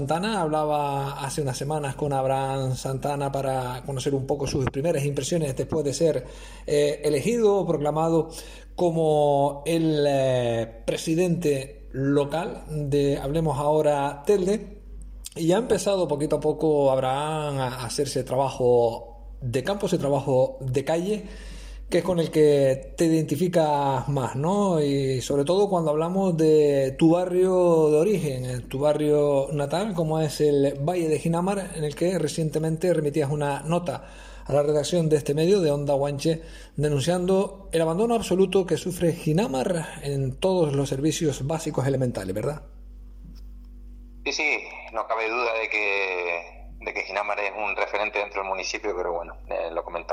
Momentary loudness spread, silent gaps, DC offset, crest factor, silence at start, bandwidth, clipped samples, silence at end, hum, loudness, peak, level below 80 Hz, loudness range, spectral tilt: 9 LU; none; under 0.1%; 14 dB; 0 s; 16 kHz; under 0.1%; 0 s; none; -24 LUFS; -10 dBFS; -46 dBFS; 5 LU; -6 dB/octave